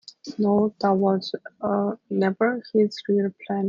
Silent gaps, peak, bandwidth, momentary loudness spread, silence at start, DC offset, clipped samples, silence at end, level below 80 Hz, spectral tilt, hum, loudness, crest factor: none; -8 dBFS; 7.2 kHz; 6 LU; 0.25 s; under 0.1%; under 0.1%; 0 s; -68 dBFS; -7.5 dB/octave; none; -24 LUFS; 16 dB